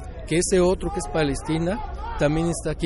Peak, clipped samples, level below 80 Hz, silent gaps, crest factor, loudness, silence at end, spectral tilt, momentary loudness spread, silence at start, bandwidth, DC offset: -10 dBFS; under 0.1%; -34 dBFS; none; 14 dB; -24 LUFS; 0 s; -5.5 dB/octave; 7 LU; 0 s; 11.5 kHz; under 0.1%